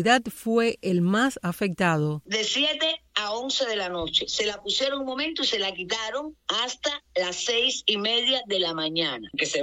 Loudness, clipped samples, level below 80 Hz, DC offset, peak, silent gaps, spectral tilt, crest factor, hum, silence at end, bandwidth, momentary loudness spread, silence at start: -25 LUFS; under 0.1%; -60 dBFS; under 0.1%; -6 dBFS; none; -3.5 dB/octave; 20 dB; none; 0 s; 16.5 kHz; 6 LU; 0 s